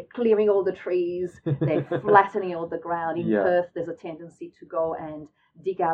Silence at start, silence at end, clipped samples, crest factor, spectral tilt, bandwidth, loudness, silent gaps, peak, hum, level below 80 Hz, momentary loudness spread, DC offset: 0 s; 0 s; under 0.1%; 22 dB; -9 dB/octave; 7.4 kHz; -25 LUFS; none; -2 dBFS; none; -66 dBFS; 19 LU; under 0.1%